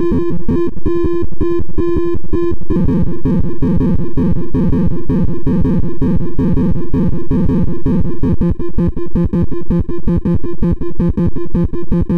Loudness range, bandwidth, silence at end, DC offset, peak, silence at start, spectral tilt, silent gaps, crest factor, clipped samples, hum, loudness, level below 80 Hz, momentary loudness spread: 1 LU; 4.6 kHz; 0 s; 30%; -4 dBFS; 0 s; -11 dB/octave; none; 10 dB; under 0.1%; none; -17 LUFS; -22 dBFS; 3 LU